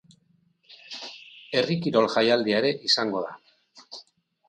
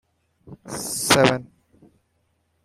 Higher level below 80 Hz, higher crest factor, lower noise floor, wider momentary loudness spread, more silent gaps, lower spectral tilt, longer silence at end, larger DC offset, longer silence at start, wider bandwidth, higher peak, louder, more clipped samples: second, -72 dBFS vs -56 dBFS; about the same, 20 dB vs 24 dB; about the same, -66 dBFS vs -69 dBFS; first, 22 LU vs 15 LU; neither; first, -4.5 dB/octave vs -3 dB/octave; second, 0.5 s vs 1.2 s; neither; first, 0.7 s vs 0.45 s; second, 10 kHz vs 16 kHz; second, -6 dBFS vs -2 dBFS; second, -23 LUFS vs -20 LUFS; neither